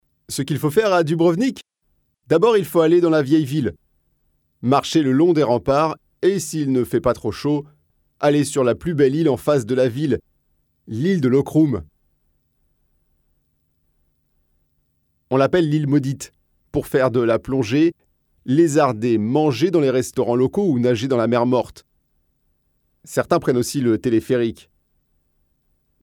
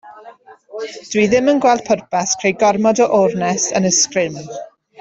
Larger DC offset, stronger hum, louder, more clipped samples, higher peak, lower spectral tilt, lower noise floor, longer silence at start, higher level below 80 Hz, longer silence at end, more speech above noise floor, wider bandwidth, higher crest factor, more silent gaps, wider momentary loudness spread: neither; neither; second, -19 LUFS vs -15 LUFS; neither; about the same, -4 dBFS vs -2 dBFS; first, -6.5 dB/octave vs -3.5 dB/octave; first, -67 dBFS vs -41 dBFS; first, 0.3 s vs 0.05 s; about the same, -52 dBFS vs -56 dBFS; first, 1.5 s vs 0.35 s; first, 50 dB vs 26 dB; first, 18 kHz vs 8.2 kHz; about the same, 16 dB vs 14 dB; neither; second, 9 LU vs 16 LU